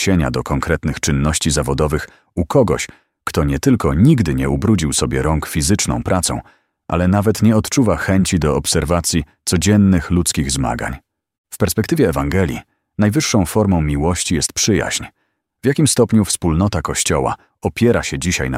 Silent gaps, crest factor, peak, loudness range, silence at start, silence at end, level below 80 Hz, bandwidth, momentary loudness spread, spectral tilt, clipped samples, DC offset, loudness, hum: 11.38-11.44 s; 16 dB; -2 dBFS; 2 LU; 0 s; 0 s; -30 dBFS; 16 kHz; 9 LU; -5 dB/octave; under 0.1%; under 0.1%; -16 LUFS; none